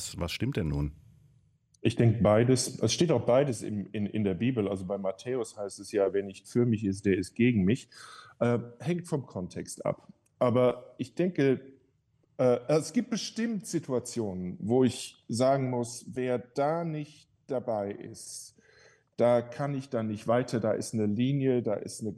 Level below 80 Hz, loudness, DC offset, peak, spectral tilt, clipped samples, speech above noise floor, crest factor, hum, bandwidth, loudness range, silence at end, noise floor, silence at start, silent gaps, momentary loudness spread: -56 dBFS; -29 LUFS; under 0.1%; -12 dBFS; -6 dB/octave; under 0.1%; 41 dB; 18 dB; none; 12.5 kHz; 5 LU; 0 s; -70 dBFS; 0 s; none; 12 LU